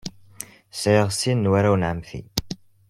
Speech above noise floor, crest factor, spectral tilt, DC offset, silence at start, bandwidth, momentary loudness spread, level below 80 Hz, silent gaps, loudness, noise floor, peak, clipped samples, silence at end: 22 dB; 20 dB; -5.5 dB/octave; under 0.1%; 0.05 s; 16.5 kHz; 19 LU; -48 dBFS; none; -22 LUFS; -42 dBFS; -4 dBFS; under 0.1%; 0.35 s